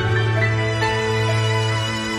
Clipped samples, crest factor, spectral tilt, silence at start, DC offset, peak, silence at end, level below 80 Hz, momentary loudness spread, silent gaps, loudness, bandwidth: under 0.1%; 12 dB; -5 dB/octave; 0 s; under 0.1%; -6 dBFS; 0 s; -42 dBFS; 2 LU; none; -20 LUFS; 11.5 kHz